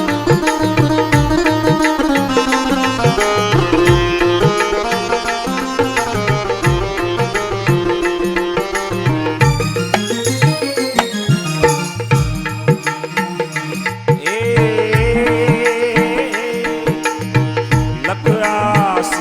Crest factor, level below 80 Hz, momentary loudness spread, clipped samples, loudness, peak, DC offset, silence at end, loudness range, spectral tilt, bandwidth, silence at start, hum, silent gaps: 14 dB; -32 dBFS; 5 LU; under 0.1%; -15 LUFS; 0 dBFS; under 0.1%; 0 s; 3 LU; -5.5 dB/octave; 16.5 kHz; 0 s; none; none